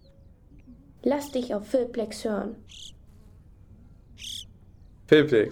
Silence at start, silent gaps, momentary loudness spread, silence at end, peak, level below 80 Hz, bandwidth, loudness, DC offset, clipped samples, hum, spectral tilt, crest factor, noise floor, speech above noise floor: 0.7 s; none; 24 LU; 0 s; -6 dBFS; -54 dBFS; 17 kHz; -26 LUFS; under 0.1%; under 0.1%; none; -5.5 dB/octave; 22 dB; -53 dBFS; 29 dB